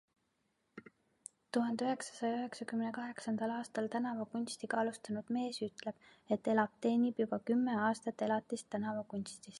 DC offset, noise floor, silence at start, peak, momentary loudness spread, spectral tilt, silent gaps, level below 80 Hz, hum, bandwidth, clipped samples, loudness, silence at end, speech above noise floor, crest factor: under 0.1%; -81 dBFS; 0.75 s; -16 dBFS; 13 LU; -5 dB/octave; none; -82 dBFS; none; 11.5 kHz; under 0.1%; -37 LUFS; 0 s; 44 dB; 20 dB